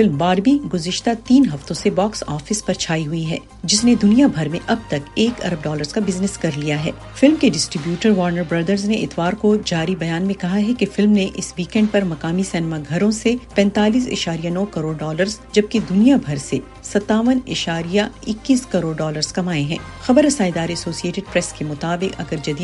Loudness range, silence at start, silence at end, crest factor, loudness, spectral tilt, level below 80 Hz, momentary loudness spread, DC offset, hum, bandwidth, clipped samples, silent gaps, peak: 2 LU; 0 s; 0 s; 18 dB; -19 LUFS; -5 dB/octave; -44 dBFS; 9 LU; under 0.1%; none; 11.5 kHz; under 0.1%; none; 0 dBFS